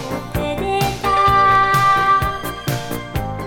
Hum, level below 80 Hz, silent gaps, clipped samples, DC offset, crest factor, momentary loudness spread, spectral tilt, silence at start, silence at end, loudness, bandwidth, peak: none; -34 dBFS; none; under 0.1%; under 0.1%; 14 dB; 12 LU; -4.5 dB/octave; 0 s; 0 s; -17 LUFS; 19 kHz; -4 dBFS